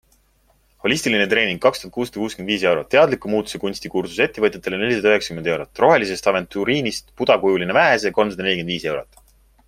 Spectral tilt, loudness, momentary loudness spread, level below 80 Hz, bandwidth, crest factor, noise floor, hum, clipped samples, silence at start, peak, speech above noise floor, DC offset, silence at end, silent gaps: -4.5 dB/octave; -19 LUFS; 10 LU; -52 dBFS; 16 kHz; 18 dB; -59 dBFS; none; under 0.1%; 0.85 s; -2 dBFS; 40 dB; under 0.1%; 0.65 s; none